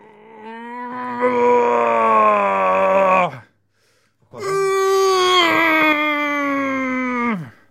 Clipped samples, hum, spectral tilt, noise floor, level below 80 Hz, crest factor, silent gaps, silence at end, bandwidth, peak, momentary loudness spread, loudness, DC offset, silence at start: under 0.1%; none; -3.5 dB/octave; -62 dBFS; -66 dBFS; 16 dB; none; 0.2 s; 15.5 kHz; -2 dBFS; 14 LU; -16 LUFS; under 0.1%; 0.35 s